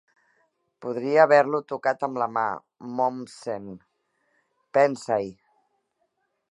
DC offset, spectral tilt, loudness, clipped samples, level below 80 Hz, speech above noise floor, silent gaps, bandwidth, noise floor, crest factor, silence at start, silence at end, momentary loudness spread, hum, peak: under 0.1%; -5.5 dB/octave; -24 LUFS; under 0.1%; -74 dBFS; 50 dB; none; 11 kHz; -74 dBFS; 22 dB; 0.8 s; 1.2 s; 18 LU; none; -4 dBFS